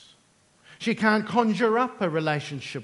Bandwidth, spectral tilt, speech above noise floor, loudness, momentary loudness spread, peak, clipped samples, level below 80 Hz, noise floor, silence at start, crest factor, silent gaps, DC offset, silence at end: 11.5 kHz; -6 dB/octave; 37 dB; -25 LUFS; 8 LU; -6 dBFS; under 0.1%; -72 dBFS; -62 dBFS; 0.7 s; 20 dB; none; under 0.1%; 0 s